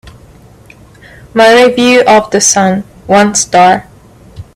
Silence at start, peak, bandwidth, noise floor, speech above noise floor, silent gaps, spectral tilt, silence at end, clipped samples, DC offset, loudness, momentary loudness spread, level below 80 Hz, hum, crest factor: 0.05 s; 0 dBFS; 19 kHz; -38 dBFS; 31 dB; none; -3 dB/octave; 0.15 s; 0.2%; under 0.1%; -7 LUFS; 8 LU; -42 dBFS; none; 10 dB